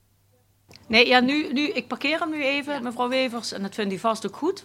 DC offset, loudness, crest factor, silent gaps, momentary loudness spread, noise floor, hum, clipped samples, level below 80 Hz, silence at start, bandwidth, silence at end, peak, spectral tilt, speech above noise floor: under 0.1%; -23 LUFS; 24 dB; none; 11 LU; -63 dBFS; none; under 0.1%; -64 dBFS; 0.9 s; 16 kHz; 0.05 s; -2 dBFS; -3.5 dB/octave; 39 dB